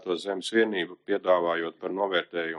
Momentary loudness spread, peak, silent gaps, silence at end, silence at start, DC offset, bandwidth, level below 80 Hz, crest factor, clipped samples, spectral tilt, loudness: 6 LU; -10 dBFS; none; 0 s; 0 s; under 0.1%; 11.5 kHz; -80 dBFS; 18 dB; under 0.1%; -4 dB/octave; -27 LUFS